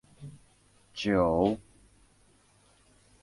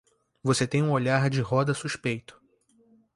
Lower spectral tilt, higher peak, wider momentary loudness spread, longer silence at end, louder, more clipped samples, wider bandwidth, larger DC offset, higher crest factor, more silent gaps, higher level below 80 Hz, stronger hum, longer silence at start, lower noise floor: about the same, -6.5 dB/octave vs -5.5 dB/octave; about the same, -12 dBFS vs -10 dBFS; first, 24 LU vs 8 LU; first, 1.6 s vs 0.85 s; about the same, -28 LUFS vs -26 LUFS; neither; about the same, 11.5 kHz vs 11.5 kHz; neither; about the same, 22 dB vs 18 dB; neither; first, -54 dBFS vs -60 dBFS; neither; second, 0.2 s vs 0.45 s; about the same, -64 dBFS vs -64 dBFS